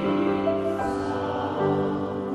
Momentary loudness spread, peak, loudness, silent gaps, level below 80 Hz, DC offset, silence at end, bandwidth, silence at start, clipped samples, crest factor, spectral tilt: 4 LU; -12 dBFS; -26 LUFS; none; -56 dBFS; under 0.1%; 0 s; 11 kHz; 0 s; under 0.1%; 14 dB; -7.5 dB/octave